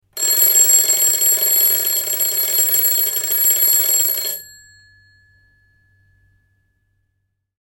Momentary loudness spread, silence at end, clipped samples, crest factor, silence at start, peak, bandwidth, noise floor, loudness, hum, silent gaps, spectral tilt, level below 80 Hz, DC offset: 7 LU; 3.15 s; under 0.1%; 16 dB; 0.15 s; -2 dBFS; 17 kHz; -71 dBFS; -13 LUFS; none; none; 2.5 dB/octave; -64 dBFS; under 0.1%